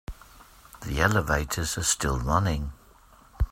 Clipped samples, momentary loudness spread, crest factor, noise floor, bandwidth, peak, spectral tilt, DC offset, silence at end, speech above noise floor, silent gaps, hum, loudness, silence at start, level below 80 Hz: under 0.1%; 14 LU; 22 dB; -55 dBFS; 16 kHz; -6 dBFS; -4 dB/octave; under 0.1%; 0 s; 29 dB; none; none; -26 LUFS; 0.1 s; -36 dBFS